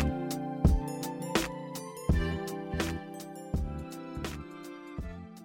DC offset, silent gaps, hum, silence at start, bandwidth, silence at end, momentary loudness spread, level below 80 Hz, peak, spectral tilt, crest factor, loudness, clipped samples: under 0.1%; none; none; 0 s; 17.5 kHz; 0 s; 14 LU; -38 dBFS; -12 dBFS; -6 dB/octave; 20 dB; -34 LUFS; under 0.1%